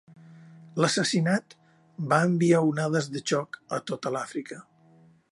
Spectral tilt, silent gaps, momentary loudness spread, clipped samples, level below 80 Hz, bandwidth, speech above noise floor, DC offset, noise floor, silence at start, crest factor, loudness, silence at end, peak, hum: -5 dB/octave; none; 15 LU; under 0.1%; -74 dBFS; 11.5 kHz; 32 dB; under 0.1%; -58 dBFS; 0.3 s; 20 dB; -26 LUFS; 0.7 s; -6 dBFS; none